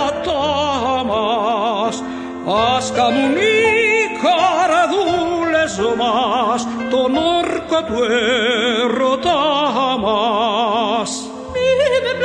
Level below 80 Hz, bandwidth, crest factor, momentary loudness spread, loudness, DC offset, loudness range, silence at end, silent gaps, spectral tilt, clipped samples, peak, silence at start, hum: -46 dBFS; 10 kHz; 14 dB; 5 LU; -16 LUFS; under 0.1%; 2 LU; 0 s; none; -3.5 dB/octave; under 0.1%; -2 dBFS; 0 s; none